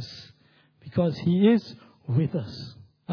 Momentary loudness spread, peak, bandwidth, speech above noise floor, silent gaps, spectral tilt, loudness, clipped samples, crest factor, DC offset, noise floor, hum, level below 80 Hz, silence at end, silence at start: 22 LU; -8 dBFS; 5.4 kHz; 38 dB; none; -9 dB/octave; -25 LUFS; under 0.1%; 18 dB; under 0.1%; -61 dBFS; none; -62 dBFS; 0 s; 0 s